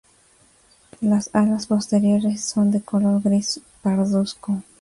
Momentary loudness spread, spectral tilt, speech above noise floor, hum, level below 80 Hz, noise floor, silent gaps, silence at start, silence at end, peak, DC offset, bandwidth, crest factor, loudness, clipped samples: 7 LU; -6 dB/octave; 36 dB; none; -58 dBFS; -56 dBFS; none; 1 s; 0.2 s; -8 dBFS; under 0.1%; 11.5 kHz; 14 dB; -21 LUFS; under 0.1%